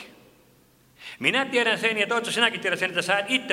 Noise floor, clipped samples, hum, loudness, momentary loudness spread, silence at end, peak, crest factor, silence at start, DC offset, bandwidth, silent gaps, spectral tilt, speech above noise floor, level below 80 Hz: -58 dBFS; under 0.1%; none; -23 LUFS; 4 LU; 0 s; -6 dBFS; 20 dB; 0 s; under 0.1%; 16 kHz; none; -2.5 dB/octave; 34 dB; -72 dBFS